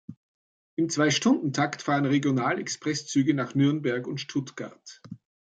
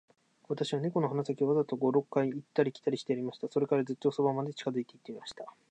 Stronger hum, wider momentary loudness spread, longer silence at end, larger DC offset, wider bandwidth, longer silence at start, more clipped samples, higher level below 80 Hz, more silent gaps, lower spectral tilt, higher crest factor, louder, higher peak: neither; first, 17 LU vs 14 LU; first, 0.4 s vs 0.2 s; neither; about the same, 9.2 kHz vs 9.2 kHz; second, 0.1 s vs 0.5 s; neither; first, -72 dBFS vs -82 dBFS; first, 0.17-0.77 s vs none; second, -5 dB/octave vs -7 dB/octave; about the same, 18 dB vs 18 dB; first, -26 LUFS vs -32 LUFS; first, -10 dBFS vs -14 dBFS